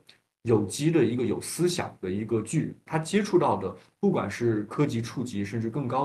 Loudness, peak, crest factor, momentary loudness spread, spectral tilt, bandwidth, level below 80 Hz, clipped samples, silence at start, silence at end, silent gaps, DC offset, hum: -27 LUFS; -10 dBFS; 16 dB; 8 LU; -6 dB/octave; 12.5 kHz; -62 dBFS; under 0.1%; 0.45 s; 0 s; none; under 0.1%; none